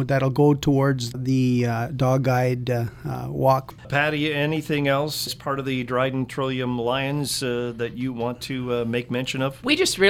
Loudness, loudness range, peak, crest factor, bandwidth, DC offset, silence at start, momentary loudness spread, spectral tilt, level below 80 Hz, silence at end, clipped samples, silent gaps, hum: -23 LUFS; 3 LU; -4 dBFS; 18 dB; 16.5 kHz; under 0.1%; 0 s; 7 LU; -5.5 dB/octave; -50 dBFS; 0 s; under 0.1%; none; none